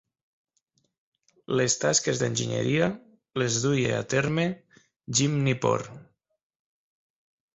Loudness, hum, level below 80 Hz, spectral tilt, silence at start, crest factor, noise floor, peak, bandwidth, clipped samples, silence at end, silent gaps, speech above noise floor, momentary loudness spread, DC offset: -26 LUFS; none; -60 dBFS; -4 dB/octave; 1.5 s; 20 dB; -73 dBFS; -8 dBFS; 8.4 kHz; under 0.1%; 1.5 s; 4.96-5.00 s; 48 dB; 7 LU; under 0.1%